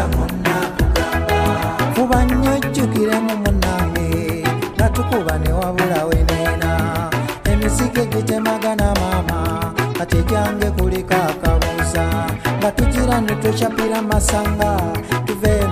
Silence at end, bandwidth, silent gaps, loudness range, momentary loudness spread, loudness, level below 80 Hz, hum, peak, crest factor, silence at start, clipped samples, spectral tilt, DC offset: 0 s; 15.5 kHz; none; 1 LU; 3 LU; -18 LUFS; -24 dBFS; none; 0 dBFS; 16 dB; 0 s; under 0.1%; -5.5 dB/octave; under 0.1%